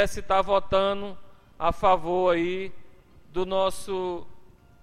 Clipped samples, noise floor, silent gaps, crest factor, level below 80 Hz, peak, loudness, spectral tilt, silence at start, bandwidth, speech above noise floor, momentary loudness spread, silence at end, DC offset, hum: under 0.1%; -48 dBFS; none; 16 dB; -44 dBFS; -8 dBFS; -26 LUFS; -5 dB/octave; 0 s; 14.5 kHz; 24 dB; 12 LU; 0.05 s; under 0.1%; none